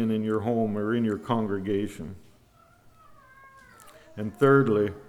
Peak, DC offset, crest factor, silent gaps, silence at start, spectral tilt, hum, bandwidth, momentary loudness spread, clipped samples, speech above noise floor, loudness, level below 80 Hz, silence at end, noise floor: -8 dBFS; under 0.1%; 20 dB; none; 0 s; -8 dB/octave; none; 13.5 kHz; 16 LU; under 0.1%; 33 dB; -26 LUFS; -60 dBFS; 0 s; -58 dBFS